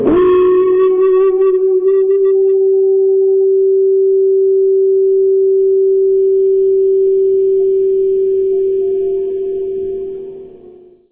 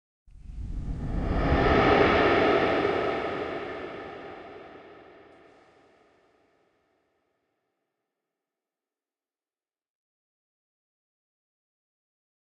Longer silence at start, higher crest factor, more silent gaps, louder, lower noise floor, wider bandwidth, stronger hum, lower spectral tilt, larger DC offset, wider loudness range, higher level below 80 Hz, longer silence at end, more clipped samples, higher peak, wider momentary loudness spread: second, 0 s vs 0.35 s; second, 10 dB vs 24 dB; neither; first, -12 LUFS vs -25 LUFS; second, -40 dBFS vs under -90 dBFS; second, 3.5 kHz vs 8.4 kHz; neither; first, -11.5 dB/octave vs -7 dB/octave; neither; second, 4 LU vs 20 LU; second, -48 dBFS vs -40 dBFS; second, 0.65 s vs 7.5 s; neither; first, -2 dBFS vs -6 dBFS; second, 8 LU vs 23 LU